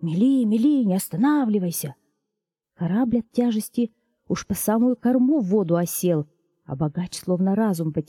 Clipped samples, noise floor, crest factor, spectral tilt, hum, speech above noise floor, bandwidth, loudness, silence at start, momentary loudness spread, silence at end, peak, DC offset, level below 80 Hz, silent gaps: under 0.1%; -84 dBFS; 14 dB; -6.5 dB/octave; none; 62 dB; 17.5 kHz; -22 LUFS; 0 s; 10 LU; 0.05 s; -8 dBFS; under 0.1%; -58 dBFS; none